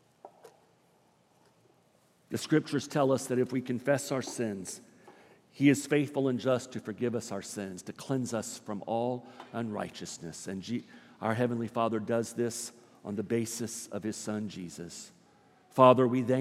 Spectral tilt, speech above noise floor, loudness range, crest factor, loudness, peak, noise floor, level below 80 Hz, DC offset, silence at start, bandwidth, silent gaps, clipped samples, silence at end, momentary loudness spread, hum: -5.5 dB/octave; 36 dB; 6 LU; 24 dB; -31 LUFS; -8 dBFS; -67 dBFS; -80 dBFS; under 0.1%; 0.25 s; 15.5 kHz; none; under 0.1%; 0 s; 15 LU; none